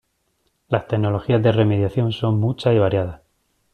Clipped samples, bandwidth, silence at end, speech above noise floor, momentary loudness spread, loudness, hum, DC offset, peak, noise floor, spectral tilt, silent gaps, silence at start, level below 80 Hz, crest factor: under 0.1%; 4.9 kHz; 0.55 s; 50 dB; 7 LU; -20 LUFS; none; under 0.1%; -4 dBFS; -68 dBFS; -9 dB/octave; none; 0.7 s; -50 dBFS; 16 dB